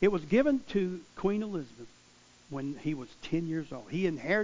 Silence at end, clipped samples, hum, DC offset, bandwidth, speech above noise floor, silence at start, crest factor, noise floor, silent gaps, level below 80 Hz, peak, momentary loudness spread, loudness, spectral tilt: 0 s; under 0.1%; none; under 0.1%; 7.6 kHz; 29 dB; 0 s; 18 dB; -60 dBFS; none; -58 dBFS; -12 dBFS; 14 LU; -32 LUFS; -7 dB/octave